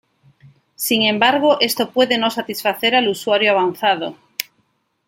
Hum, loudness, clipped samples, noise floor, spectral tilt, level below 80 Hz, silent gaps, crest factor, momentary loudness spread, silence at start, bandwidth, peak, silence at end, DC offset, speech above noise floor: none; -17 LUFS; under 0.1%; -65 dBFS; -3 dB/octave; -66 dBFS; none; 18 dB; 13 LU; 0.8 s; 17 kHz; 0 dBFS; 0.65 s; under 0.1%; 48 dB